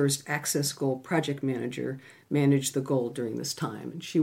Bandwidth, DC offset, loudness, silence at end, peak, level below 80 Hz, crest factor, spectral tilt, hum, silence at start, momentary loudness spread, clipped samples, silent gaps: 16.5 kHz; under 0.1%; -29 LUFS; 0 s; -12 dBFS; -74 dBFS; 16 dB; -5 dB/octave; none; 0 s; 10 LU; under 0.1%; none